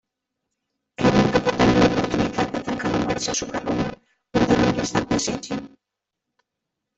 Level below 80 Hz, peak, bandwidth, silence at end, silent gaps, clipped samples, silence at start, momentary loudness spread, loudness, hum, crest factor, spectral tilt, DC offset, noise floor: -44 dBFS; -4 dBFS; 8.4 kHz; 1.3 s; none; under 0.1%; 1 s; 9 LU; -22 LUFS; none; 20 dB; -5 dB/octave; under 0.1%; -83 dBFS